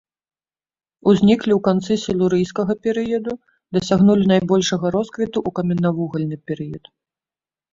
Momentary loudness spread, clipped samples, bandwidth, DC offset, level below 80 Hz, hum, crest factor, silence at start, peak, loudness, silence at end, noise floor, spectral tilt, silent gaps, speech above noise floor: 13 LU; under 0.1%; 7.6 kHz; under 0.1%; -52 dBFS; none; 16 dB; 1.05 s; -2 dBFS; -19 LUFS; 0.95 s; under -90 dBFS; -6.5 dB/octave; none; over 72 dB